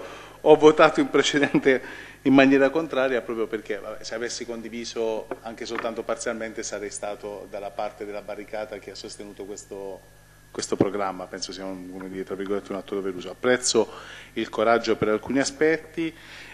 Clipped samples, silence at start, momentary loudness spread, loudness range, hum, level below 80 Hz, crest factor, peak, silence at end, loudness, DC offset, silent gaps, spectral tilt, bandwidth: under 0.1%; 0 s; 19 LU; 13 LU; 50 Hz at -55 dBFS; -58 dBFS; 24 dB; 0 dBFS; 0 s; -24 LUFS; 0.1%; none; -4 dB/octave; 13 kHz